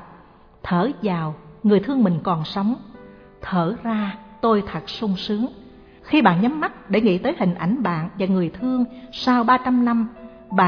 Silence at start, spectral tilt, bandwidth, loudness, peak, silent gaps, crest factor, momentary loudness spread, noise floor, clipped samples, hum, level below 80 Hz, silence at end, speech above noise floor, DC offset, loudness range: 0 s; -8 dB/octave; 5.4 kHz; -21 LUFS; -2 dBFS; none; 18 dB; 9 LU; -48 dBFS; under 0.1%; none; -52 dBFS; 0 s; 28 dB; under 0.1%; 4 LU